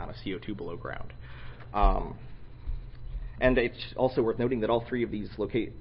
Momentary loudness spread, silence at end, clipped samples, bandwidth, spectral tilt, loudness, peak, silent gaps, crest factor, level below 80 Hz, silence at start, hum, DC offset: 19 LU; 0 s; under 0.1%; 5.6 kHz; -10.5 dB/octave; -30 LUFS; -10 dBFS; none; 20 dB; -36 dBFS; 0 s; none; under 0.1%